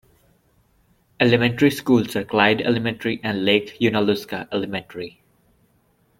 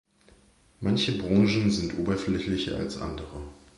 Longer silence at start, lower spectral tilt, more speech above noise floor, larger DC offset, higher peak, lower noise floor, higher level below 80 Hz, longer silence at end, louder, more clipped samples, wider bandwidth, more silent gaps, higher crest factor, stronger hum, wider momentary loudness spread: first, 1.2 s vs 0.8 s; about the same, -6 dB/octave vs -6 dB/octave; first, 42 dB vs 33 dB; neither; first, -2 dBFS vs -10 dBFS; about the same, -62 dBFS vs -59 dBFS; second, -58 dBFS vs -46 dBFS; first, 1.1 s vs 0.25 s; first, -20 LUFS vs -27 LUFS; neither; first, 16.5 kHz vs 11.5 kHz; neither; about the same, 20 dB vs 18 dB; neither; about the same, 11 LU vs 13 LU